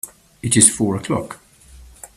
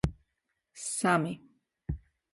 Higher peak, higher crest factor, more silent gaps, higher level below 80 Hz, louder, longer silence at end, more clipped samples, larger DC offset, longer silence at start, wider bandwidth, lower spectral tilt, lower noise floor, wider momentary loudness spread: first, 0 dBFS vs -12 dBFS; about the same, 20 dB vs 22 dB; neither; about the same, -48 dBFS vs -48 dBFS; first, -16 LUFS vs -32 LUFS; second, 0.1 s vs 0.35 s; neither; neither; about the same, 0.05 s vs 0.05 s; first, 16 kHz vs 11.5 kHz; second, -3.5 dB/octave vs -5 dB/octave; second, -45 dBFS vs -82 dBFS; first, 22 LU vs 17 LU